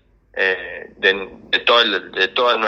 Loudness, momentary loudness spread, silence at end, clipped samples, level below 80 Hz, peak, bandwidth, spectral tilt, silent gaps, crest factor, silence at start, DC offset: -17 LUFS; 11 LU; 0 s; under 0.1%; -56 dBFS; 0 dBFS; 7.6 kHz; -3 dB/octave; none; 18 dB; 0.35 s; under 0.1%